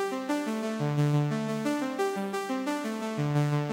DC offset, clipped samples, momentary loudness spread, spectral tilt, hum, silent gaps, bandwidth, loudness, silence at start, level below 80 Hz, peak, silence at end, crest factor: under 0.1%; under 0.1%; 5 LU; -6.5 dB/octave; none; none; 16.5 kHz; -30 LUFS; 0 s; -72 dBFS; -16 dBFS; 0 s; 14 dB